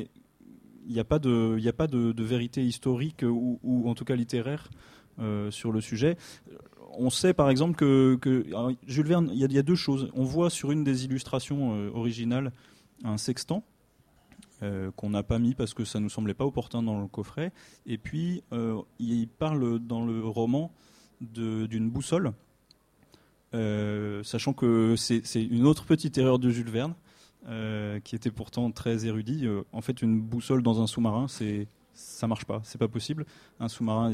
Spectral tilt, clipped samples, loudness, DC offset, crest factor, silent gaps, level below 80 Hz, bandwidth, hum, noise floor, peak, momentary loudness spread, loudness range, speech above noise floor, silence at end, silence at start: -6.5 dB/octave; under 0.1%; -29 LUFS; under 0.1%; 20 dB; none; -54 dBFS; 14.5 kHz; none; -64 dBFS; -10 dBFS; 12 LU; 7 LU; 36 dB; 0 s; 0 s